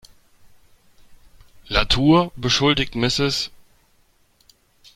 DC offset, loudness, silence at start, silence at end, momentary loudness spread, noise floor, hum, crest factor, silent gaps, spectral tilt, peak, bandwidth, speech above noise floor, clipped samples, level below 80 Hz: under 0.1%; -19 LUFS; 1.1 s; 1.5 s; 7 LU; -59 dBFS; none; 20 dB; none; -4.5 dB/octave; -2 dBFS; 15.5 kHz; 41 dB; under 0.1%; -38 dBFS